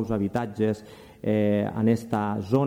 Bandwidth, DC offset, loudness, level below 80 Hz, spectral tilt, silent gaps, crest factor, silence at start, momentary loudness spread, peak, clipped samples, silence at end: 14.5 kHz; under 0.1%; -26 LUFS; -56 dBFS; -8.5 dB/octave; none; 16 dB; 0 s; 5 LU; -10 dBFS; under 0.1%; 0 s